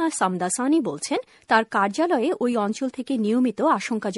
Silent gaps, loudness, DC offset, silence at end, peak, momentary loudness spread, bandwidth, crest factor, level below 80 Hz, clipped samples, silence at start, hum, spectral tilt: none; -23 LUFS; under 0.1%; 0 s; -4 dBFS; 6 LU; 11.5 kHz; 18 dB; -70 dBFS; under 0.1%; 0 s; none; -4.5 dB/octave